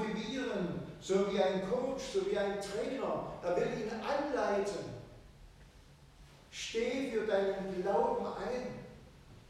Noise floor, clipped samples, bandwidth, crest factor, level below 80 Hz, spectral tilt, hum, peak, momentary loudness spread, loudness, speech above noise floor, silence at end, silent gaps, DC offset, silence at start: -58 dBFS; under 0.1%; 13 kHz; 18 dB; -60 dBFS; -5 dB/octave; none; -18 dBFS; 11 LU; -35 LUFS; 24 dB; 0.1 s; none; under 0.1%; 0 s